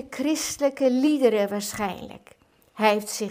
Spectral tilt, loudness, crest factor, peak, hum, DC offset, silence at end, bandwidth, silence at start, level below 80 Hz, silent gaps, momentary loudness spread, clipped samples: -3.5 dB/octave; -24 LUFS; 20 dB; -6 dBFS; none; under 0.1%; 0 s; 16.5 kHz; 0 s; -60 dBFS; none; 10 LU; under 0.1%